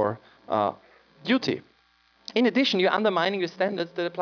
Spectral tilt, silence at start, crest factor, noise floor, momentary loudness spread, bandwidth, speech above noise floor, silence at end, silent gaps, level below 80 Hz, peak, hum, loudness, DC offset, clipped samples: -5.5 dB/octave; 0 s; 18 dB; -63 dBFS; 11 LU; 5.4 kHz; 39 dB; 0 s; none; -76 dBFS; -8 dBFS; none; -25 LUFS; under 0.1%; under 0.1%